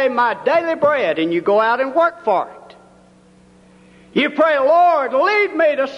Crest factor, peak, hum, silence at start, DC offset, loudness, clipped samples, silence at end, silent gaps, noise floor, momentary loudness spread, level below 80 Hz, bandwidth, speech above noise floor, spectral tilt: 12 dB; -4 dBFS; none; 0 s; under 0.1%; -16 LUFS; under 0.1%; 0 s; none; -49 dBFS; 6 LU; -64 dBFS; 10 kHz; 33 dB; -5.5 dB/octave